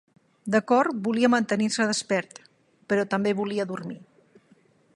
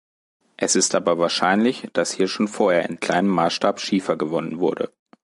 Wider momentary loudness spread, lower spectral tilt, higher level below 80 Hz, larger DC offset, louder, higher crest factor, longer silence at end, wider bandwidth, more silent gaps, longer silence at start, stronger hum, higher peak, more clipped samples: first, 16 LU vs 6 LU; about the same, -4.5 dB/octave vs -3.5 dB/octave; second, -74 dBFS vs -66 dBFS; neither; second, -25 LUFS vs -21 LUFS; about the same, 20 dB vs 18 dB; first, 0.95 s vs 0.35 s; about the same, 11.5 kHz vs 11.5 kHz; neither; second, 0.45 s vs 0.6 s; neither; about the same, -6 dBFS vs -4 dBFS; neither